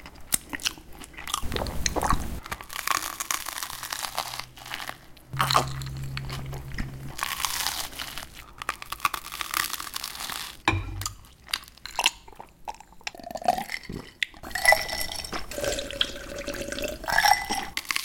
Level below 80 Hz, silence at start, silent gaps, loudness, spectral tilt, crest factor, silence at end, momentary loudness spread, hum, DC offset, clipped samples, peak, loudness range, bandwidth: -42 dBFS; 0 s; none; -29 LUFS; -2 dB/octave; 26 dB; 0 s; 15 LU; none; under 0.1%; under 0.1%; -4 dBFS; 4 LU; 17 kHz